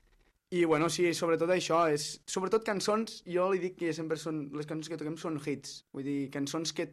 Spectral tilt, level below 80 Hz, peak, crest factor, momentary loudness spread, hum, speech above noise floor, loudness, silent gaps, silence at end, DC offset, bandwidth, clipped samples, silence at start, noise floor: -4.5 dB/octave; -70 dBFS; -16 dBFS; 16 dB; 10 LU; none; 36 dB; -32 LUFS; none; 0 s; under 0.1%; 13.5 kHz; under 0.1%; 0.5 s; -68 dBFS